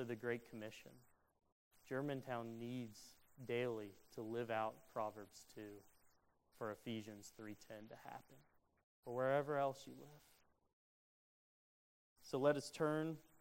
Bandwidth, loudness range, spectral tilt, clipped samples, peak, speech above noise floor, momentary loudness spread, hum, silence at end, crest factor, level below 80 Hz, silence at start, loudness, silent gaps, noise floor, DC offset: 16 kHz; 8 LU; -6 dB/octave; under 0.1%; -24 dBFS; 30 dB; 19 LU; none; 0.2 s; 24 dB; -82 dBFS; 0 s; -45 LUFS; 1.52-1.71 s, 8.83-9.03 s, 10.73-12.16 s; -76 dBFS; under 0.1%